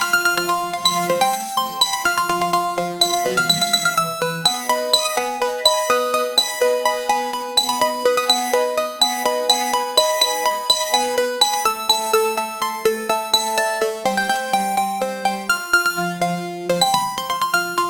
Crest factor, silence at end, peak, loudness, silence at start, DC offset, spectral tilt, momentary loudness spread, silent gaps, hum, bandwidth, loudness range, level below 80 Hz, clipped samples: 20 dB; 0 s; 0 dBFS; -18 LUFS; 0 s; under 0.1%; -1.5 dB/octave; 5 LU; none; none; over 20 kHz; 2 LU; -58 dBFS; under 0.1%